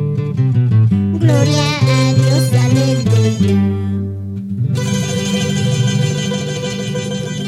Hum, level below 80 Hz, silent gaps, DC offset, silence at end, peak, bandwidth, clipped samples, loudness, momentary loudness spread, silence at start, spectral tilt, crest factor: none; -46 dBFS; none; under 0.1%; 0 s; 0 dBFS; 13.5 kHz; under 0.1%; -15 LUFS; 8 LU; 0 s; -6 dB/octave; 14 dB